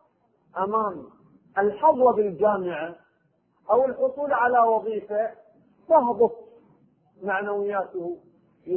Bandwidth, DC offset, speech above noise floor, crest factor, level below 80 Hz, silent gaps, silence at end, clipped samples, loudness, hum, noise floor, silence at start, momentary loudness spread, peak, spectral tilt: 3.4 kHz; under 0.1%; 45 dB; 18 dB; -66 dBFS; none; 0 s; under 0.1%; -24 LUFS; none; -67 dBFS; 0.55 s; 16 LU; -6 dBFS; -10.5 dB/octave